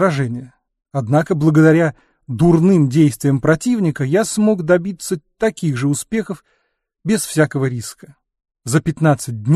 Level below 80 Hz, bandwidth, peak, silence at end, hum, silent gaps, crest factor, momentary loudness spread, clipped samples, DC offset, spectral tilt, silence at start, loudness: -48 dBFS; 13.5 kHz; -2 dBFS; 0 s; none; none; 16 dB; 14 LU; under 0.1%; under 0.1%; -6.5 dB/octave; 0 s; -16 LUFS